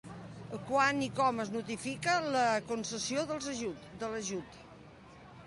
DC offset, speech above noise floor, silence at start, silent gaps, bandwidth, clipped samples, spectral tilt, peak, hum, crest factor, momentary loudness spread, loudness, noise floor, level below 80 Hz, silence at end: under 0.1%; 20 dB; 0.05 s; none; 11.5 kHz; under 0.1%; -3.5 dB/octave; -14 dBFS; none; 20 dB; 19 LU; -33 LUFS; -54 dBFS; -66 dBFS; 0 s